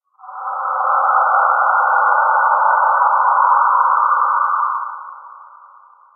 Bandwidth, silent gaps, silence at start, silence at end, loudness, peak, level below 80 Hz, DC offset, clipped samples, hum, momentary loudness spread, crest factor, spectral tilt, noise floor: 1.7 kHz; none; 0.25 s; 0.75 s; -14 LUFS; 0 dBFS; under -90 dBFS; under 0.1%; under 0.1%; none; 13 LU; 14 dB; 19.5 dB/octave; -46 dBFS